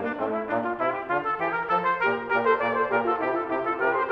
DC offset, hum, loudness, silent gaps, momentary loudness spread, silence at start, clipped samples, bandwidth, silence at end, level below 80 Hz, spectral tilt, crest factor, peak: under 0.1%; none; -25 LUFS; none; 4 LU; 0 s; under 0.1%; 6 kHz; 0 s; -62 dBFS; -7 dB/octave; 16 dB; -10 dBFS